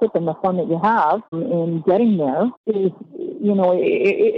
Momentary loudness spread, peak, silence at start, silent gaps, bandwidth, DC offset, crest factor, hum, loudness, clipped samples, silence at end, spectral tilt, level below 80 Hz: 7 LU; -6 dBFS; 0 s; 2.57-2.64 s; 6 kHz; under 0.1%; 12 dB; none; -19 LUFS; under 0.1%; 0 s; -9.5 dB/octave; -64 dBFS